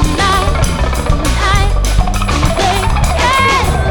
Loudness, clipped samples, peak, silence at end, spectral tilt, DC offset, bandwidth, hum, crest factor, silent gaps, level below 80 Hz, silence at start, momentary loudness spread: -13 LUFS; under 0.1%; 0 dBFS; 0 s; -4.5 dB/octave; under 0.1%; 19 kHz; none; 12 dB; none; -14 dBFS; 0 s; 5 LU